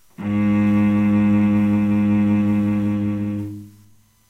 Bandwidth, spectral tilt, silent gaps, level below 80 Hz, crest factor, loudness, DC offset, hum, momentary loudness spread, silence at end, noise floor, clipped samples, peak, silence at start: 4.1 kHz; -9.5 dB/octave; none; -48 dBFS; 10 dB; -19 LUFS; under 0.1%; none; 9 LU; 0.6 s; -53 dBFS; under 0.1%; -8 dBFS; 0.2 s